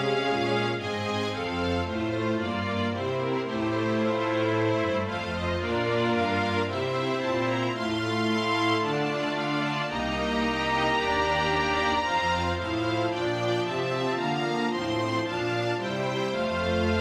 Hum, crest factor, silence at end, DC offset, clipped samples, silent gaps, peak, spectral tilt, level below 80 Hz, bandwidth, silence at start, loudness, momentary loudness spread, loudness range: none; 14 dB; 0 s; under 0.1%; under 0.1%; none; -14 dBFS; -5.5 dB/octave; -50 dBFS; 13 kHz; 0 s; -27 LUFS; 4 LU; 2 LU